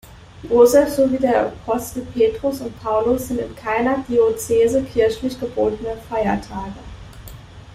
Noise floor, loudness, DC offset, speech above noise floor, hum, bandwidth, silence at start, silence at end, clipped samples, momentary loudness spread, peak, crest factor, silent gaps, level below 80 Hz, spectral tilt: -38 dBFS; -19 LUFS; under 0.1%; 20 dB; none; 16 kHz; 0.05 s; 0 s; under 0.1%; 18 LU; -2 dBFS; 18 dB; none; -42 dBFS; -5.5 dB/octave